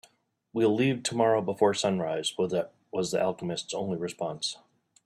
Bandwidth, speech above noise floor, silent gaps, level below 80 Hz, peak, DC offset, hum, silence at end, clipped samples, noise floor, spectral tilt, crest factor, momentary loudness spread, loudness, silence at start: 12.5 kHz; 38 dB; none; -70 dBFS; -10 dBFS; under 0.1%; none; 0.5 s; under 0.1%; -66 dBFS; -4.5 dB/octave; 20 dB; 9 LU; -29 LUFS; 0.55 s